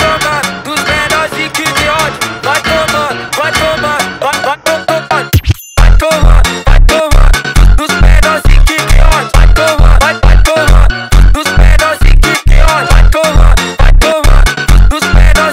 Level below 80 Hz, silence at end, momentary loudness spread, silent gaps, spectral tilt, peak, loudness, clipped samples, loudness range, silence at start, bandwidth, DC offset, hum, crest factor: -8 dBFS; 0 s; 5 LU; none; -4.5 dB/octave; 0 dBFS; -9 LUFS; 4%; 3 LU; 0 s; 16 kHz; under 0.1%; none; 6 dB